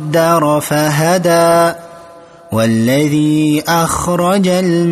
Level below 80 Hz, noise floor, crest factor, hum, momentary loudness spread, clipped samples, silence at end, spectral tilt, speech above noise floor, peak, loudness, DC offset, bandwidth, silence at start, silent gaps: -42 dBFS; -37 dBFS; 12 dB; none; 4 LU; under 0.1%; 0 s; -5.5 dB/octave; 26 dB; 0 dBFS; -12 LUFS; under 0.1%; 15 kHz; 0 s; none